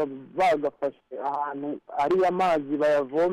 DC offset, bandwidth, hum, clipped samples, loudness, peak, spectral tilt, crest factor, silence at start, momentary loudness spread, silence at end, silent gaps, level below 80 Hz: under 0.1%; 12.5 kHz; none; under 0.1%; -26 LUFS; -16 dBFS; -6 dB/octave; 8 dB; 0 s; 10 LU; 0 s; none; -64 dBFS